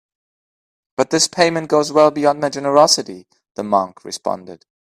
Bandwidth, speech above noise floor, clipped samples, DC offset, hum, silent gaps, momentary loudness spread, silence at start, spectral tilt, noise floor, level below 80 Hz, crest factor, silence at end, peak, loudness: 14.5 kHz; over 73 dB; under 0.1%; under 0.1%; none; 3.51-3.55 s; 16 LU; 1 s; -3 dB/octave; under -90 dBFS; -62 dBFS; 18 dB; 0.3 s; 0 dBFS; -16 LUFS